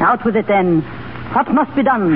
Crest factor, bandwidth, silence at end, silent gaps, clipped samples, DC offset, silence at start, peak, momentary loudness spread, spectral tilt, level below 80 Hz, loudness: 12 dB; 5.2 kHz; 0 s; none; under 0.1%; under 0.1%; 0 s; -4 dBFS; 8 LU; -12 dB/octave; -46 dBFS; -16 LUFS